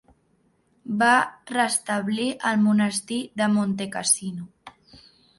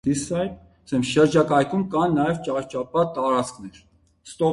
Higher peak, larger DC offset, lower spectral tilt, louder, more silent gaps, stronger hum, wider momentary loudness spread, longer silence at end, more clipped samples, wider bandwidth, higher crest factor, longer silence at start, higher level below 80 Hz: about the same, -6 dBFS vs -6 dBFS; neither; second, -3.5 dB/octave vs -6 dB/octave; about the same, -23 LUFS vs -22 LUFS; neither; neither; about the same, 13 LU vs 13 LU; first, 0.7 s vs 0 s; neither; about the same, 12 kHz vs 11.5 kHz; about the same, 18 dB vs 18 dB; first, 0.85 s vs 0.05 s; second, -66 dBFS vs -54 dBFS